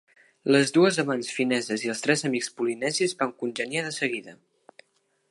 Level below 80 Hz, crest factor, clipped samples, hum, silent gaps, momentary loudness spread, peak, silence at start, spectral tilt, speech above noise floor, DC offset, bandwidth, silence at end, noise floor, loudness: -78 dBFS; 22 dB; under 0.1%; none; none; 8 LU; -6 dBFS; 0.45 s; -4 dB/octave; 45 dB; under 0.1%; 11.5 kHz; 0.95 s; -70 dBFS; -25 LUFS